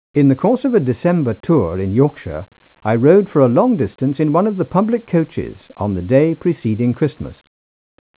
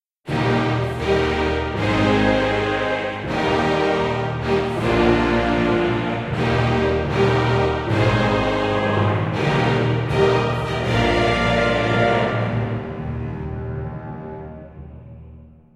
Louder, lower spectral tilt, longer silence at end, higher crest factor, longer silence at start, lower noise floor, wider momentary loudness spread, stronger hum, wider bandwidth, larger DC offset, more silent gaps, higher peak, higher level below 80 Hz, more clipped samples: first, -16 LUFS vs -20 LUFS; first, -13 dB/octave vs -7 dB/octave; first, 0.85 s vs 0.25 s; about the same, 16 dB vs 18 dB; about the same, 0.15 s vs 0.25 s; first, under -90 dBFS vs -43 dBFS; about the same, 13 LU vs 11 LU; neither; second, 4 kHz vs 11 kHz; neither; neither; about the same, 0 dBFS vs -2 dBFS; second, -42 dBFS vs -36 dBFS; neither